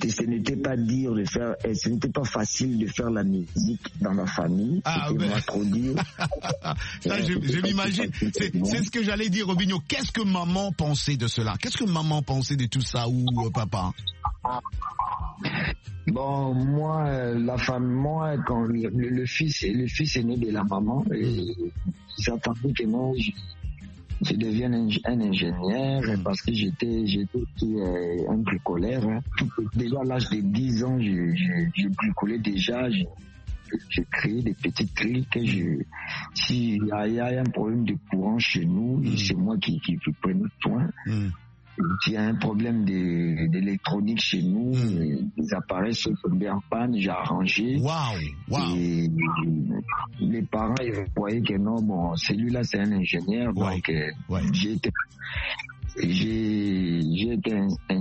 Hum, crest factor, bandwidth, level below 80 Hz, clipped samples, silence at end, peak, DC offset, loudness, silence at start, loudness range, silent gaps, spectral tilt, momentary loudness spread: none; 18 dB; 8.4 kHz; -44 dBFS; under 0.1%; 0 s; -8 dBFS; under 0.1%; -26 LUFS; 0 s; 2 LU; none; -6 dB/octave; 5 LU